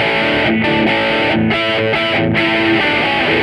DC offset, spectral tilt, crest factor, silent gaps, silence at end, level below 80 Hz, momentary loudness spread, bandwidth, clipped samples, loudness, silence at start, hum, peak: under 0.1%; -6 dB/octave; 12 dB; none; 0 s; -40 dBFS; 2 LU; 11.5 kHz; under 0.1%; -13 LUFS; 0 s; none; -2 dBFS